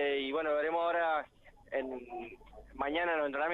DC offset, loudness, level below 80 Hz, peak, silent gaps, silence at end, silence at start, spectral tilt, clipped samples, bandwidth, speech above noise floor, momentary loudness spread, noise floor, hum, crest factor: under 0.1%; -34 LUFS; -62 dBFS; -18 dBFS; none; 0 s; 0 s; -5.5 dB/octave; under 0.1%; 6.8 kHz; 24 dB; 18 LU; -58 dBFS; none; 16 dB